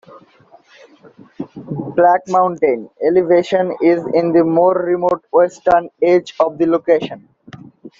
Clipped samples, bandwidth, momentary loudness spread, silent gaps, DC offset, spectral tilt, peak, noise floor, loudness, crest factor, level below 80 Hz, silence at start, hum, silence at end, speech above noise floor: under 0.1%; 7.4 kHz; 13 LU; none; under 0.1%; -7 dB/octave; -2 dBFS; -38 dBFS; -15 LUFS; 14 dB; -56 dBFS; 0.15 s; none; 0.1 s; 23 dB